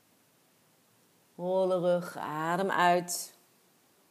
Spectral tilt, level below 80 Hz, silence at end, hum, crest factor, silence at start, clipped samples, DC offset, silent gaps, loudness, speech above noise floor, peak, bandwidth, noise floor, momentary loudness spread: -4.5 dB/octave; under -90 dBFS; 0.8 s; none; 22 dB; 1.4 s; under 0.1%; under 0.1%; none; -30 LUFS; 38 dB; -10 dBFS; 15.5 kHz; -67 dBFS; 11 LU